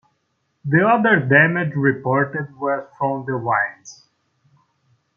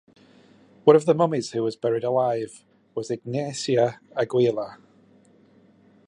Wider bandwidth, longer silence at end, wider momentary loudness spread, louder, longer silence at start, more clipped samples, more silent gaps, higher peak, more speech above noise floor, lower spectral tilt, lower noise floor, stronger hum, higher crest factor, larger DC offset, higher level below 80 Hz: second, 7.2 kHz vs 10.5 kHz; about the same, 1.25 s vs 1.35 s; second, 10 LU vs 14 LU; first, -18 LUFS vs -23 LUFS; second, 0.65 s vs 0.85 s; neither; neither; about the same, -2 dBFS vs -2 dBFS; first, 51 dB vs 34 dB; first, -7.5 dB/octave vs -6 dB/octave; first, -70 dBFS vs -56 dBFS; neither; about the same, 18 dB vs 22 dB; neither; first, -64 dBFS vs -72 dBFS